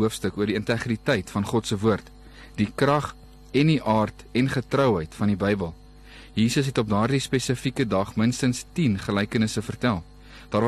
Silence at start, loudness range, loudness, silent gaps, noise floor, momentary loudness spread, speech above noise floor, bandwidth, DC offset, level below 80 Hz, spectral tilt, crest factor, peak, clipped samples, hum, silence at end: 0 s; 2 LU; -25 LUFS; none; -46 dBFS; 6 LU; 22 dB; 13 kHz; under 0.1%; -48 dBFS; -6 dB/octave; 16 dB; -8 dBFS; under 0.1%; none; 0 s